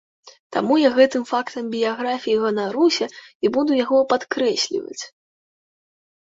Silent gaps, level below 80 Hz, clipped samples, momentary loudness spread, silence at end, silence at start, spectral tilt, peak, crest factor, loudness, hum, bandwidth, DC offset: 0.39-0.50 s, 3.35-3.40 s; -68 dBFS; under 0.1%; 11 LU; 1.15 s; 0.25 s; -3.5 dB/octave; -4 dBFS; 18 dB; -20 LUFS; none; 8 kHz; under 0.1%